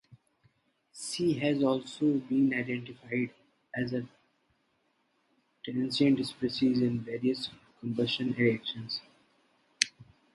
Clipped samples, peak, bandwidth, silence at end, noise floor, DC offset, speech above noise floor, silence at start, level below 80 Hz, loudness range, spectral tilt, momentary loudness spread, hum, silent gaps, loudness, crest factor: under 0.1%; -2 dBFS; 11.5 kHz; 0.3 s; -74 dBFS; under 0.1%; 44 dB; 0.1 s; -70 dBFS; 5 LU; -5 dB/octave; 11 LU; none; none; -31 LUFS; 30 dB